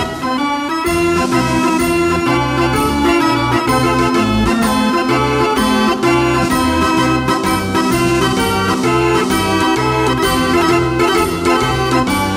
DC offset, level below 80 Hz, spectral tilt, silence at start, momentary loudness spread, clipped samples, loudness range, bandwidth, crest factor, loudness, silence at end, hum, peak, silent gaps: under 0.1%; -32 dBFS; -5 dB/octave; 0 s; 2 LU; under 0.1%; 1 LU; 16 kHz; 14 dB; -14 LUFS; 0 s; none; 0 dBFS; none